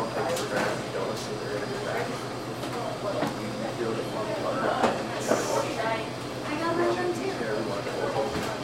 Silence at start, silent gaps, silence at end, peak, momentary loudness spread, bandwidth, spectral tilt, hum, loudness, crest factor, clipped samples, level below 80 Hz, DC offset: 0 s; none; 0 s; -10 dBFS; 6 LU; 16 kHz; -4.5 dB/octave; none; -29 LUFS; 18 dB; under 0.1%; -58 dBFS; under 0.1%